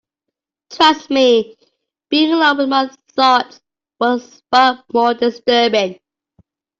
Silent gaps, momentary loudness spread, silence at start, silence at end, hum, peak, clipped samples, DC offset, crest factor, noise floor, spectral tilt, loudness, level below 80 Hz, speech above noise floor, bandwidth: none; 8 LU; 0.7 s; 0.85 s; none; -2 dBFS; under 0.1%; under 0.1%; 14 dB; -81 dBFS; -3.5 dB/octave; -15 LUFS; -62 dBFS; 67 dB; 7.8 kHz